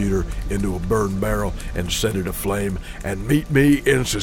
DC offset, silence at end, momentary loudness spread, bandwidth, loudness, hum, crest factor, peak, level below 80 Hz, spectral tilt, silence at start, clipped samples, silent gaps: under 0.1%; 0 s; 11 LU; 18 kHz; -21 LUFS; none; 16 dB; -4 dBFS; -30 dBFS; -5.5 dB/octave; 0 s; under 0.1%; none